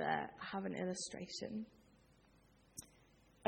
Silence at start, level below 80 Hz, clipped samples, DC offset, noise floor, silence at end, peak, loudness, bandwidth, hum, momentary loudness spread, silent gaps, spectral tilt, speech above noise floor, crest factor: 0 s; -74 dBFS; under 0.1%; under 0.1%; -69 dBFS; 0 s; -22 dBFS; -45 LUFS; 18 kHz; none; 14 LU; none; -4 dB/octave; 24 dB; 24 dB